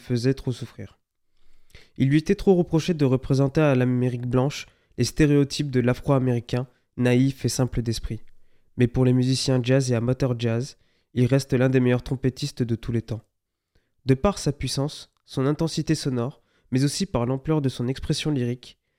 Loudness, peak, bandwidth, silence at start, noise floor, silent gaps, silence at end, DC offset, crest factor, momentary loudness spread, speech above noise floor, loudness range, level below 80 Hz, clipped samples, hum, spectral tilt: -24 LUFS; -6 dBFS; 14.5 kHz; 0.05 s; -69 dBFS; none; 0.3 s; under 0.1%; 18 dB; 13 LU; 47 dB; 4 LU; -44 dBFS; under 0.1%; none; -6.5 dB/octave